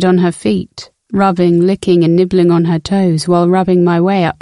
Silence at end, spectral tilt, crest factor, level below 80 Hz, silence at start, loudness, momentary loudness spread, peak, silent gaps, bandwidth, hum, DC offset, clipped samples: 0.1 s; -7.5 dB/octave; 12 dB; -46 dBFS; 0 s; -12 LUFS; 6 LU; 0 dBFS; none; 11.5 kHz; none; under 0.1%; under 0.1%